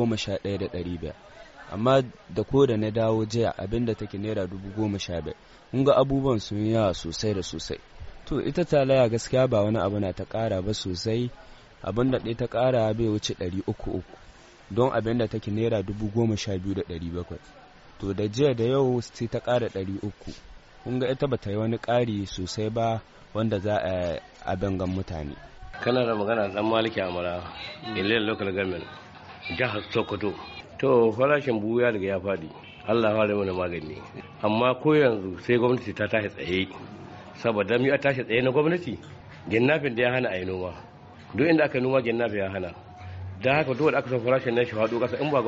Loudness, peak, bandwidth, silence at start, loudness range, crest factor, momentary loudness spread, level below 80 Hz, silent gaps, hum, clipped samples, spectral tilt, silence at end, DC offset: -26 LUFS; -8 dBFS; 8 kHz; 0 s; 4 LU; 18 dB; 14 LU; -50 dBFS; none; none; under 0.1%; -5 dB/octave; 0 s; under 0.1%